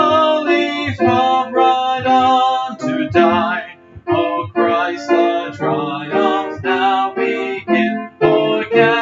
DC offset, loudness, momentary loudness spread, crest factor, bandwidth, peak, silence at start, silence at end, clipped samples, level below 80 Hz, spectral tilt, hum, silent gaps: under 0.1%; -16 LUFS; 7 LU; 14 dB; 7.6 kHz; 0 dBFS; 0 s; 0 s; under 0.1%; -54 dBFS; -6 dB/octave; none; none